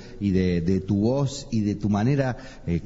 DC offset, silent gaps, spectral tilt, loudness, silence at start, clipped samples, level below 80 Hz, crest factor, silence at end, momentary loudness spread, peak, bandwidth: under 0.1%; none; -7.5 dB/octave; -24 LUFS; 0 s; under 0.1%; -44 dBFS; 14 dB; 0 s; 6 LU; -10 dBFS; 8 kHz